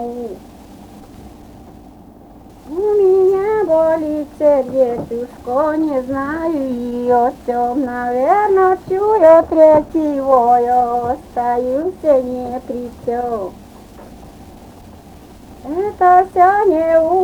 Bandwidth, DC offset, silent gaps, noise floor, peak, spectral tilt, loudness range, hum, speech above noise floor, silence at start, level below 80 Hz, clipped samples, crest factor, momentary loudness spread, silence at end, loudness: 19.5 kHz; under 0.1%; none; -40 dBFS; 0 dBFS; -7 dB/octave; 9 LU; none; 26 dB; 0 s; -44 dBFS; under 0.1%; 16 dB; 14 LU; 0 s; -15 LUFS